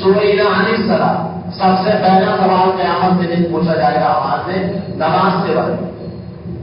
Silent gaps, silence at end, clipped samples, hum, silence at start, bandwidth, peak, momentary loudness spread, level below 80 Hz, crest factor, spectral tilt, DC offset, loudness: none; 0 s; under 0.1%; none; 0 s; 5.4 kHz; 0 dBFS; 11 LU; -44 dBFS; 14 dB; -11.5 dB/octave; under 0.1%; -14 LUFS